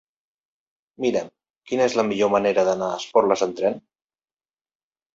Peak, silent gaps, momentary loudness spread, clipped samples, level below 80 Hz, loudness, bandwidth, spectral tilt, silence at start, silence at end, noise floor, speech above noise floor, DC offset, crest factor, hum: -4 dBFS; 1.50-1.54 s; 9 LU; under 0.1%; -66 dBFS; -22 LUFS; 7.8 kHz; -4.5 dB/octave; 1 s; 1.35 s; under -90 dBFS; over 69 dB; under 0.1%; 20 dB; none